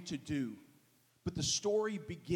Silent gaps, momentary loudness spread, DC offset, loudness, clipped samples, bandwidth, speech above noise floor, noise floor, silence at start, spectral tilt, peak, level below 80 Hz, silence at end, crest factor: none; 12 LU; under 0.1%; -37 LUFS; under 0.1%; 16.5 kHz; 33 dB; -69 dBFS; 0 s; -4 dB/octave; -22 dBFS; -64 dBFS; 0 s; 16 dB